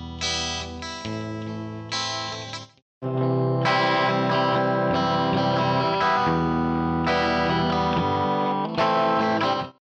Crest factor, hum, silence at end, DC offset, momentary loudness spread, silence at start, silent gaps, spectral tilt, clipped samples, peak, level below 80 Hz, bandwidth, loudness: 12 dB; none; 0.15 s; under 0.1%; 11 LU; 0 s; 2.82-3.01 s; -5 dB/octave; under 0.1%; -12 dBFS; -48 dBFS; 8.8 kHz; -23 LUFS